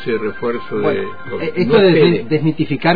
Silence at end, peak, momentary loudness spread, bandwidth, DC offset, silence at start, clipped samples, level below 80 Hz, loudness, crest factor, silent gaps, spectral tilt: 0 s; -2 dBFS; 12 LU; 5 kHz; 3%; 0 s; under 0.1%; -50 dBFS; -16 LUFS; 14 dB; none; -9.5 dB/octave